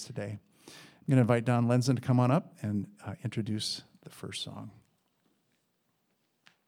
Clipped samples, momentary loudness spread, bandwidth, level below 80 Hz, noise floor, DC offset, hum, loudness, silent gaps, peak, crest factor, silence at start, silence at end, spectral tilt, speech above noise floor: under 0.1%; 20 LU; 13.5 kHz; -78 dBFS; -76 dBFS; under 0.1%; none; -30 LUFS; none; -10 dBFS; 22 dB; 0 s; 1.95 s; -6.5 dB/octave; 46 dB